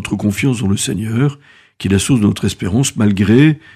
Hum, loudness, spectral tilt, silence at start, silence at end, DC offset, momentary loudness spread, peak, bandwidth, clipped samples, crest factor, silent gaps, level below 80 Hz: none; -15 LUFS; -5.5 dB/octave; 0 s; 0.15 s; under 0.1%; 7 LU; 0 dBFS; 15.5 kHz; under 0.1%; 14 dB; none; -46 dBFS